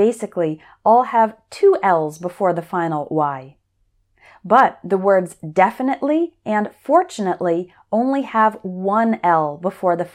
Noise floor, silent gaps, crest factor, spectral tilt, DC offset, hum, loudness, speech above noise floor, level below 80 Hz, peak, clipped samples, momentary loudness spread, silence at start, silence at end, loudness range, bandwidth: -64 dBFS; none; 18 dB; -6.5 dB/octave; under 0.1%; none; -18 LUFS; 46 dB; -66 dBFS; -2 dBFS; under 0.1%; 9 LU; 0 s; 0.05 s; 2 LU; 14.5 kHz